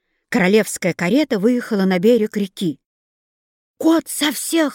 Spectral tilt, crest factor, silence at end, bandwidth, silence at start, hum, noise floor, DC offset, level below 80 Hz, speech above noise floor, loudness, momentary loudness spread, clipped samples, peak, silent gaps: -5 dB/octave; 16 dB; 0 s; 17 kHz; 0.3 s; none; under -90 dBFS; under 0.1%; -62 dBFS; over 73 dB; -18 LUFS; 8 LU; under 0.1%; -4 dBFS; 2.86-3.74 s